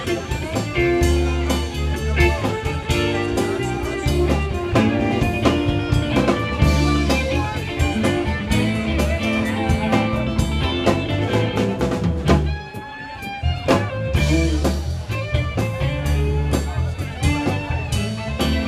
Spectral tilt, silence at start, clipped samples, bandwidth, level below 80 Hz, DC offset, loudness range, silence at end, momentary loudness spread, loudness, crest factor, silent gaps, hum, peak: -6 dB/octave; 0 s; under 0.1%; 15 kHz; -26 dBFS; under 0.1%; 3 LU; 0 s; 6 LU; -20 LUFS; 18 dB; none; none; -2 dBFS